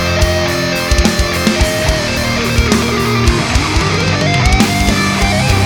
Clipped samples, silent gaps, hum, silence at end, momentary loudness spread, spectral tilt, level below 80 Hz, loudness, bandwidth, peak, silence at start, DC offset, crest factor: under 0.1%; none; none; 0 s; 3 LU; -4.5 dB/octave; -18 dBFS; -13 LUFS; 19.5 kHz; 0 dBFS; 0 s; under 0.1%; 12 dB